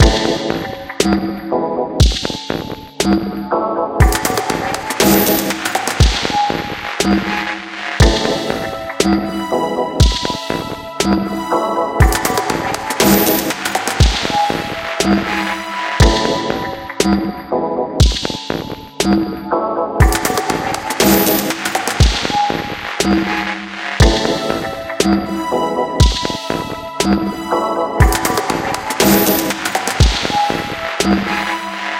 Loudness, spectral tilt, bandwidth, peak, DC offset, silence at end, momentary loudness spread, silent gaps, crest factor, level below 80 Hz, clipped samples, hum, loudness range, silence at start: -16 LUFS; -4.5 dB/octave; 17.5 kHz; 0 dBFS; under 0.1%; 0 s; 9 LU; none; 16 dB; -22 dBFS; under 0.1%; none; 2 LU; 0 s